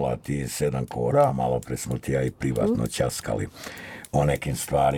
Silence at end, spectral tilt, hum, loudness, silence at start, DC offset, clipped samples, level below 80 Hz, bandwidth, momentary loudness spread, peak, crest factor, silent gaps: 0 s; -6 dB/octave; none; -26 LUFS; 0 s; under 0.1%; under 0.1%; -44 dBFS; 18 kHz; 9 LU; -8 dBFS; 16 dB; none